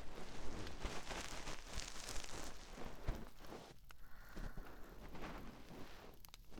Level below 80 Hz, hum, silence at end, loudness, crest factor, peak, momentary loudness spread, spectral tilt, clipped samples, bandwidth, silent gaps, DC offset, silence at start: -54 dBFS; none; 0 s; -52 LUFS; 22 dB; -24 dBFS; 11 LU; -3.5 dB/octave; under 0.1%; 18.5 kHz; none; under 0.1%; 0 s